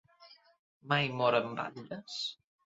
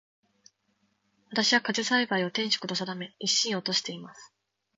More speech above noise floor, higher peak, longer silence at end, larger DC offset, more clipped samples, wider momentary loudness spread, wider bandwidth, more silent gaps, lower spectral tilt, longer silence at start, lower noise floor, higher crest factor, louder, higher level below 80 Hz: second, 27 dB vs 44 dB; about the same, -12 dBFS vs -12 dBFS; about the same, 0.45 s vs 0.5 s; neither; neither; about the same, 12 LU vs 12 LU; second, 7.6 kHz vs 9.2 kHz; first, 0.59-0.81 s vs none; about the same, -3 dB/octave vs -2 dB/octave; second, 0.2 s vs 1.3 s; second, -60 dBFS vs -73 dBFS; about the same, 22 dB vs 20 dB; second, -33 LUFS vs -27 LUFS; about the same, -76 dBFS vs -78 dBFS